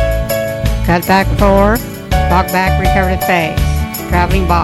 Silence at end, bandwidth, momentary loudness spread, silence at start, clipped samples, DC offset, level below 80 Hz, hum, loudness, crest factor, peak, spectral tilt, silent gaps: 0 s; 16.5 kHz; 6 LU; 0 s; under 0.1%; under 0.1%; -18 dBFS; none; -13 LUFS; 12 dB; 0 dBFS; -5.5 dB/octave; none